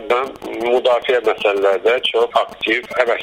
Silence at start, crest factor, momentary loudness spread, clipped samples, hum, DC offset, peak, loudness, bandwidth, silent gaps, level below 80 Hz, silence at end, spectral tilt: 0 s; 16 dB; 4 LU; under 0.1%; none; under 0.1%; 0 dBFS; -17 LUFS; 16 kHz; none; -56 dBFS; 0 s; -3 dB/octave